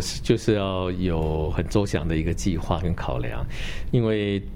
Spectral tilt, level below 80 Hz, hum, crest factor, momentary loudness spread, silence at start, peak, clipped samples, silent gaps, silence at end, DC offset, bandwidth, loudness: -6 dB/octave; -32 dBFS; none; 18 dB; 7 LU; 0 s; -6 dBFS; under 0.1%; none; 0 s; under 0.1%; 16 kHz; -25 LUFS